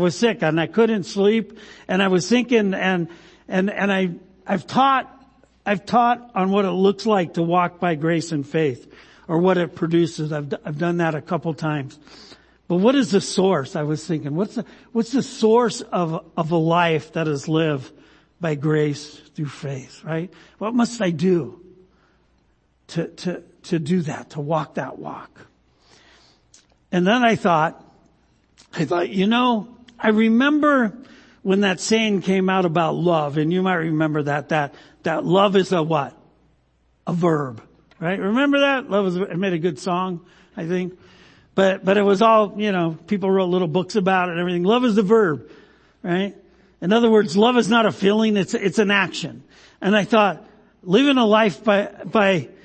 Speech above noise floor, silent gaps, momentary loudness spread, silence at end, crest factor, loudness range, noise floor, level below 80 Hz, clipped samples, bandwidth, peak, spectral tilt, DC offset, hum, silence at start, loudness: 43 dB; none; 13 LU; 0.15 s; 18 dB; 6 LU; -62 dBFS; -62 dBFS; under 0.1%; 8.8 kHz; -2 dBFS; -6 dB/octave; under 0.1%; none; 0 s; -20 LUFS